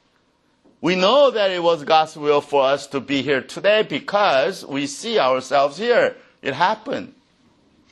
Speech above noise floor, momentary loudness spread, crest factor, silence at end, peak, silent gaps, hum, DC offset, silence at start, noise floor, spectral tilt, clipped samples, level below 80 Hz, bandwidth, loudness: 44 dB; 10 LU; 18 dB; 0.8 s; -2 dBFS; none; none; under 0.1%; 0.8 s; -62 dBFS; -4 dB/octave; under 0.1%; -68 dBFS; 12 kHz; -19 LUFS